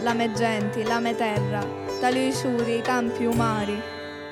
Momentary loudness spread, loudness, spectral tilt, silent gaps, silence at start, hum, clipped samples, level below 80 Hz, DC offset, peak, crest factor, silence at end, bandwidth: 6 LU; -25 LUFS; -5.5 dB/octave; none; 0 s; none; under 0.1%; -56 dBFS; under 0.1%; -10 dBFS; 16 dB; 0 s; 16 kHz